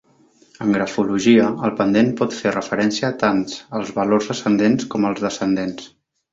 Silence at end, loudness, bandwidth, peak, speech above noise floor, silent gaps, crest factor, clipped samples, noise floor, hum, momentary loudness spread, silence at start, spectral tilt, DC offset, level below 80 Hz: 0.45 s; -19 LUFS; 7.8 kHz; -2 dBFS; 36 dB; none; 18 dB; under 0.1%; -55 dBFS; none; 9 LU; 0.6 s; -5.5 dB/octave; under 0.1%; -56 dBFS